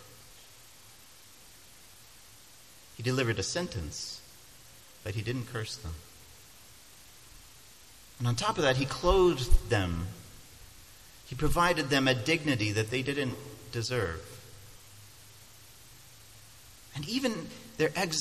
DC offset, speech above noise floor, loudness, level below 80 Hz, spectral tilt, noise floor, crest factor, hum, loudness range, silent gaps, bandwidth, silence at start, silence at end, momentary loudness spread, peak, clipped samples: under 0.1%; 26 dB; -30 LUFS; -42 dBFS; -4.5 dB/octave; -55 dBFS; 24 dB; none; 11 LU; none; 14.5 kHz; 0 s; 0 s; 26 LU; -8 dBFS; under 0.1%